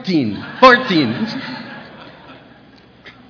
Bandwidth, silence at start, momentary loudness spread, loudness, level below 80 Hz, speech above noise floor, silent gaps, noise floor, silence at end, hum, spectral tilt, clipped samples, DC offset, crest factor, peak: 5.4 kHz; 0 s; 22 LU; -14 LUFS; -52 dBFS; 31 dB; none; -45 dBFS; 0.2 s; none; -6 dB/octave; 0.2%; under 0.1%; 18 dB; 0 dBFS